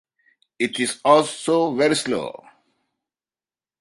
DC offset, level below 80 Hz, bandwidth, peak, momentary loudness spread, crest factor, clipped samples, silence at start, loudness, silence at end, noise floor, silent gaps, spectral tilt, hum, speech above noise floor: under 0.1%; -68 dBFS; 11.5 kHz; -2 dBFS; 10 LU; 20 dB; under 0.1%; 0.6 s; -20 LUFS; 1.5 s; under -90 dBFS; none; -3.5 dB/octave; none; over 70 dB